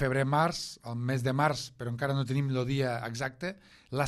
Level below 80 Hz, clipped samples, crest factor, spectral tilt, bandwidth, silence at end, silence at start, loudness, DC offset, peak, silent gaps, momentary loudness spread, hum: -58 dBFS; under 0.1%; 18 dB; -6 dB/octave; 13 kHz; 0 s; 0 s; -31 LUFS; under 0.1%; -12 dBFS; none; 11 LU; none